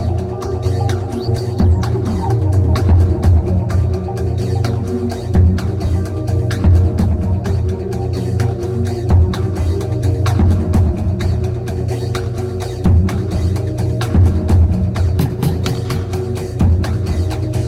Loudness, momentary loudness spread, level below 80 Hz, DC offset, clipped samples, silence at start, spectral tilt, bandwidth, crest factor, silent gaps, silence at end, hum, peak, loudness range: -17 LUFS; 7 LU; -22 dBFS; under 0.1%; under 0.1%; 0 s; -8 dB/octave; 12.5 kHz; 12 dB; none; 0 s; none; -2 dBFS; 2 LU